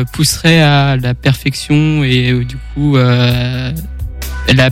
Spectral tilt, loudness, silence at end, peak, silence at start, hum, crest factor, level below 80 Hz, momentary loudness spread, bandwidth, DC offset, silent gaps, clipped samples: -5.5 dB/octave; -12 LUFS; 0 s; 0 dBFS; 0 s; none; 12 dB; -26 dBFS; 13 LU; 16.5 kHz; under 0.1%; none; under 0.1%